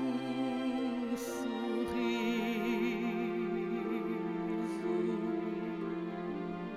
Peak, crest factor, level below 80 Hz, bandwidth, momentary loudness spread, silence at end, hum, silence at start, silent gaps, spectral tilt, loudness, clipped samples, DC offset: -22 dBFS; 14 dB; -66 dBFS; 15.5 kHz; 5 LU; 0 s; none; 0 s; none; -6 dB/octave; -35 LUFS; under 0.1%; under 0.1%